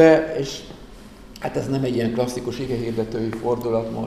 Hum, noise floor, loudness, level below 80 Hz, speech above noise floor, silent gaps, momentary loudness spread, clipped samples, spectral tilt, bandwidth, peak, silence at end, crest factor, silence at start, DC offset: none; -42 dBFS; -23 LUFS; -46 dBFS; 21 dB; none; 20 LU; under 0.1%; -6.5 dB/octave; 15 kHz; -2 dBFS; 0 s; 20 dB; 0 s; 0.2%